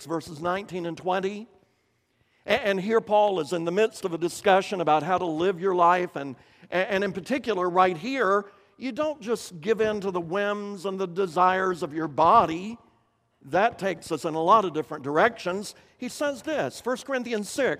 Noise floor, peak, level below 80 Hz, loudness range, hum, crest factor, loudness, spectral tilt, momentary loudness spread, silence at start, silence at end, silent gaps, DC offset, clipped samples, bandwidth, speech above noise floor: -70 dBFS; -6 dBFS; -64 dBFS; 3 LU; none; 20 dB; -25 LUFS; -5 dB/octave; 12 LU; 0 s; 0 s; none; under 0.1%; under 0.1%; 15.5 kHz; 45 dB